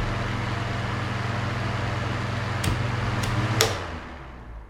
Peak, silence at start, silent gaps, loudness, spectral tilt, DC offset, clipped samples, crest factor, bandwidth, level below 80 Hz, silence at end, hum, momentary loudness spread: 0 dBFS; 0 s; none; -27 LUFS; -4.5 dB/octave; under 0.1%; under 0.1%; 26 dB; 16 kHz; -40 dBFS; 0 s; none; 11 LU